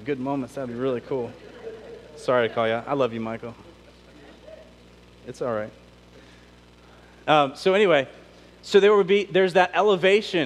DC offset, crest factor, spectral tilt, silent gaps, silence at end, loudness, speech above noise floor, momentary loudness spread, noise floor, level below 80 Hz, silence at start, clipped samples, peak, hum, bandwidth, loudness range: under 0.1%; 20 dB; -5.5 dB/octave; none; 0 s; -22 LUFS; 29 dB; 21 LU; -51 dBFS; -58 dBFS; 0 s; under 0.1%; -4 dBFS; 60 Hz at -55 dBFS; 11 kHz; 17 LU